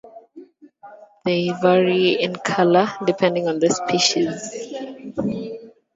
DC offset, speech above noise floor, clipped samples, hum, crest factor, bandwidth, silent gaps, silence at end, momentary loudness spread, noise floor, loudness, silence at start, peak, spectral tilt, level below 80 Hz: under 0.1%; 27 dB; under 0.1%; none; 20 dB; 7.8 kHz; none; 0.25 s; 14 LU; -46 dBFS; -20 LUFS; 0.05 s; -2 dBFS; -4.5 dB/octave; -62 dBFS